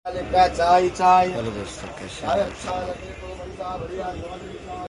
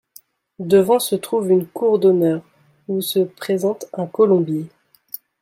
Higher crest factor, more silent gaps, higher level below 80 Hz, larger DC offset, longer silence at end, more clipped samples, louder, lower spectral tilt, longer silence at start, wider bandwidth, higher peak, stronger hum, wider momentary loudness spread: about the same, 18 dB vs 16 dB; neither; first, -42 dBFS vs -66 dBFS; neither; second, 0 s vs 0.75 s; neither; second, -22 LUFS vs -18 LUFS; about the same, -5 dB/octave vs -6 dB/octave; second, 0.05 s vs 0.6 s; second, 11.5 kHz vs 16.5 kHz; second, -6 dBFS vs -2 dBFS; neither; about the same, 18 LU vs 16 LU